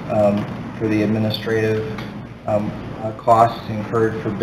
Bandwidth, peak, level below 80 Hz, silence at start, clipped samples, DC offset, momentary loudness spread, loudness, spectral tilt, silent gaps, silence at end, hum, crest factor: 15 kHz; 0 dBFS; -46 dBFS; 0 s; under 0.1%; under 0.1%; 13 LU; -20 LUFS; -7.5 dB/octave; none; 0 s; none; 20 dB